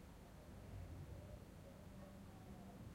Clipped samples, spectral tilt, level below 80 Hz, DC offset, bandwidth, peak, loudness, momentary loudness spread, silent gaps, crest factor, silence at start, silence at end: under 0.1%; -6.5 dB/octave; -64 dBFS; under 0.1%; 16 kHz; -44 dBFS; -58 LUFS; 4 LU; none; 12 dB; 0 s; 0 s